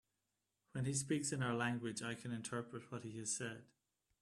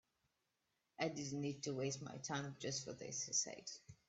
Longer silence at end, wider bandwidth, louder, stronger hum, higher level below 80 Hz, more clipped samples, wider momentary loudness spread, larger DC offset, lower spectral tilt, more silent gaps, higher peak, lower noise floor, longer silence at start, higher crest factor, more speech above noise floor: first, 0.6 s vs 0.15 s; first, 13 kHz vs 8.4 kHz; about the same, -42 LUFS vs -44 LUFS; neither; about the same, -76 dBFS vs -80 dBFS; neither; first, 11 LU vs 7 LU; neither; about the same, -4 dB/octave vs -3 dB/octave; neither; about the same, -24 dBFS vs -24 dBFS; about the same, -88 dBFS vs -87 dBFS; second, 0.75 s vs 1 s; about the same, 20 dB vs 22 dB; first, 46 dB vs 42 dB